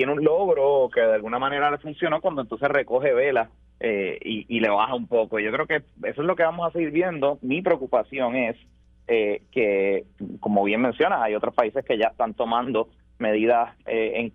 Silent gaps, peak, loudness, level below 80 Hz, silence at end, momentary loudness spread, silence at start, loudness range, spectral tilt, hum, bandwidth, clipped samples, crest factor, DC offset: none; -4 dBFS; -23 LUFS; -58 dBFS; 0.05 s; 7 LU; 0 s; 2 LU; -8 dB/octave; none; 4.7 kHz; under 0.1%; 20 dB; under 0.1%